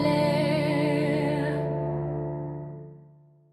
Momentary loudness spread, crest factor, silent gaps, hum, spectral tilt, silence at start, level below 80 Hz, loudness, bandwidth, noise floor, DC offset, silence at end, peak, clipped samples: 15 LU; 16 dB; none; none; -7.5 dB/octave; 0 s; -54 dBFS; -27 LUFS; 13 kHz; -55 dBFS; under 0.1%; 0.5 s; -12 dBFS; under 0.1%